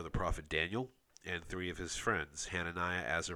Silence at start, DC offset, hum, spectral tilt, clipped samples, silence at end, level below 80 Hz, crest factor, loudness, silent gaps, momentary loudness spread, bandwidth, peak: 0 s; under 0.1%; none; -3.5 dB/octave; under 0.1%; 0 s; -50 dBFS; 20 dB; -38 LUFS; none; 7 LU; over 20 kHz; -18 dBFS